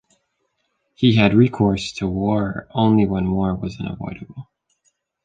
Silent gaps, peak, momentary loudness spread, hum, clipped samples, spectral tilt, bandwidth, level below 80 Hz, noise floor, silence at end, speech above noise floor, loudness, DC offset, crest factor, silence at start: none; -2 dBFS; 16 LU; none; under 0.1%; -7 dB/octave; 9.2 kHz; -42 dBFS; -71 dBFS; 0.8 s; 53 dB; -19 LUFS; under 0.1%; 18 dB; 1 s